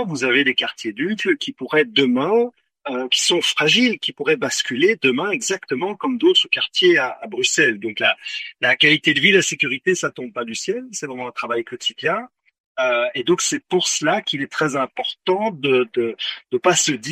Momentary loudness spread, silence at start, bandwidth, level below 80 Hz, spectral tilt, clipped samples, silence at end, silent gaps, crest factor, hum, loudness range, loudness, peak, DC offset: 11 LU; 0 s; 14 kHz; -68 dBFS; -2.5 dB/octave; under 0.1%; 0 s; 12.60-12.75 s; 18 dB; none; 6 LU; -19 LUFS; 0 dBFS; under 0.1%